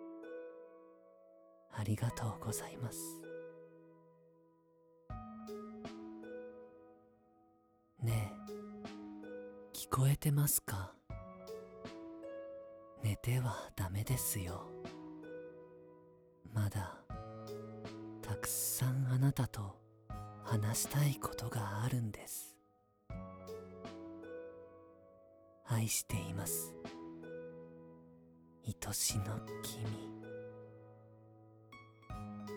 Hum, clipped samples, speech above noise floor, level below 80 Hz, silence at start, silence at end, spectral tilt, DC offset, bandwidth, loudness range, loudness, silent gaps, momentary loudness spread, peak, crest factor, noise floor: none; under 0.1%; 35 dB; -62 dBFS; 0 s; 0 s; -5 dB/octave; under 0.1%; over 20 kHz; 12 LU; -40 LUFS; none; 22 LU; -20 dBFS; 22 dB; -72 dBFS